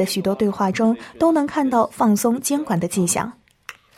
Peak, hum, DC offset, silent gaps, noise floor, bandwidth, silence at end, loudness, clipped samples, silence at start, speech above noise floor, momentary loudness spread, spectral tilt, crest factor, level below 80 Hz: -4 dBFS; none; under 0.1%; none; -43 dBFS; 16.5 kHz; 0.25 s; -20 LUFS; under 0.1%; 0 s; 23 dB; 9 LU; -5 dB/octave; 16 dB; -58 dBFS